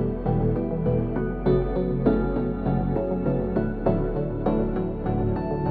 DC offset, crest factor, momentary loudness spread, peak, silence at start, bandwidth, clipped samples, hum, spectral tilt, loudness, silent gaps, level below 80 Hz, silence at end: under 0.1%; 16 dB; 3 LU; -8 dBFS; 0 s; 4.7 kHz; under 0.1%; none; -12.5 dB/octave; -25 LUFS; none; -32 dBFS; 0 s